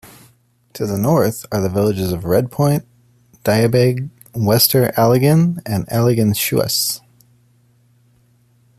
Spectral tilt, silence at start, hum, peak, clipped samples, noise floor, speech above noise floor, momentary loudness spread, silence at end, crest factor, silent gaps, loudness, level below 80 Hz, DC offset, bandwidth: -5.5 dB/octave; 0.05 s; none; 0 dBFS; under 0.1%; -55 dBFS; 40 dB; 10 LU; 1.8 s; 18 dB; none; -16 LUFS; -50 dBFS; under 0.1%; 15 kHz